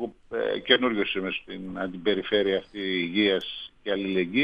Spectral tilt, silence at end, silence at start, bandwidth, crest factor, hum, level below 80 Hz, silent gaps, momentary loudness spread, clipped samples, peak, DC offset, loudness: -6.5 dB/octave; 0 s; 0 s; 6.8 kHz; 22 dB; none; -60 dBFS; none; 12 LU; under 0.1%; -4 dBFS; under 0.1%; -26 LUFS